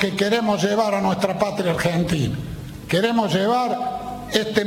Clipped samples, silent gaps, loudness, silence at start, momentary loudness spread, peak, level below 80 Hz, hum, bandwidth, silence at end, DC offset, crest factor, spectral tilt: under 0.1%; none; -21 LUFS; 0 s; 8 LU; -2 dBFS; -46 dBFS; none; 17 kHz; 0 s; under 0.1%; 20 dB; -5.5 dB/octave